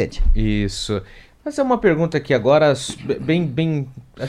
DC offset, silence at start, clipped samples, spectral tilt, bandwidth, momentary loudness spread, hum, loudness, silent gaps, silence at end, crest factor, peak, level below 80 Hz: under 0.1%; 0 s; under 0.1%; -6 dB/octave; 11 kHz; 11 LU; none; -19 LUFS; none; 0 s; 16 dB; -2 dBFS; -26 dBFS